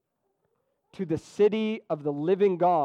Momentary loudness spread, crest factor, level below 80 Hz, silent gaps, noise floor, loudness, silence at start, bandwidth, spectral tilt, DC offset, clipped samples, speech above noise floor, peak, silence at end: 9 LU; 14 dB; -68 dBFS; none; -76 dBFS; -26 LUFS; 1 s; 9 kHz; -7.5 dB/octave; under 0.1%; under 0.1%; 51 dB; -12 dBFS; 0 s